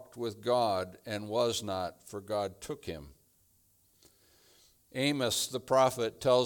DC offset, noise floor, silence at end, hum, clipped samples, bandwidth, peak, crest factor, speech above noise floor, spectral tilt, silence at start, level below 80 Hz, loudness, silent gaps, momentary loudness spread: under 0.1%; -68 dBFS; 0 s; none; under 0.1%; 19 kHz; -12 dBFS; 20 dB; 37 dB; -4 dB/octave; 0 s; -66 dBFS; -32 LUFS; none; 14 LU